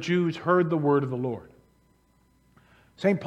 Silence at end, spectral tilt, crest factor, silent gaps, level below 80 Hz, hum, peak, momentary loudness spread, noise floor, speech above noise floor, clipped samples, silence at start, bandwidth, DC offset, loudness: 0 s; -7.5 dB/octave; 18 dB; none; -66 dBFS; none; -8 dBFS; 9 LU; -64 dBFS; 39 dB; under 0.1%; 0 s; 8.6 kHz; under 0.1%; -25 LUFS